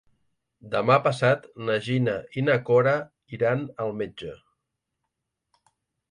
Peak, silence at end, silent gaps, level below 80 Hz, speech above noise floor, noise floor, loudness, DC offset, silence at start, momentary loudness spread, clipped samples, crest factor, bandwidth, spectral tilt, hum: -6 dBFS; 1.75 s; none; -64 dBFS; 58 dB; -82 dBFS; -24 LUFS; under 0.1%; 0.65 s; 13 LU; under 0.1%; 22 dB; 10.5 kHz; -7 dB/octave; none